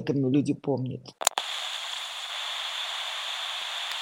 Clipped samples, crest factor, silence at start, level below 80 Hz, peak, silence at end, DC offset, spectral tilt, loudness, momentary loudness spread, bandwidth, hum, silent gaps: under 0.1%; 28 dB; 0 s; -74 dBFS; -2 dBFS; 0 s; under 0.1%; -3.5 dB/octave; -29 LUFS; 7 LU; 16.5 kHz; none; none